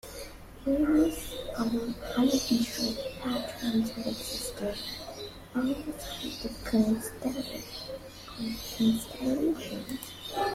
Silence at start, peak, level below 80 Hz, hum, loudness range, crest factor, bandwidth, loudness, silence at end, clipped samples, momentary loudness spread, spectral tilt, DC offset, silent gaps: 0.05 s; -14 dBFS; -50 dBFS; none; 4 LU; 18 dB; 16 kHz; -31 LUFS; 0 s; under 0.1%; 13 LU; -4.5 dB/octave; under 0.1%; none